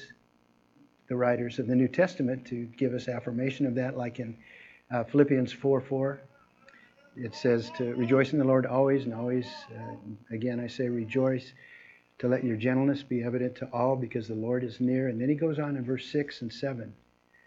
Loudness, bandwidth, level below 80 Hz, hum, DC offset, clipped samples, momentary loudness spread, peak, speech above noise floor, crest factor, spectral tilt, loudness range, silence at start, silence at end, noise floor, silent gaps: -29 LUFS; 7.6 kHz; -70 dBFS; none; under 0.1%; under 0.1%; 15 LU; -8 dBFS; 37 dB; 20 dB; -8 dB/octave; 3 LU; 0 s; 0.55 s; -66 dBFS; none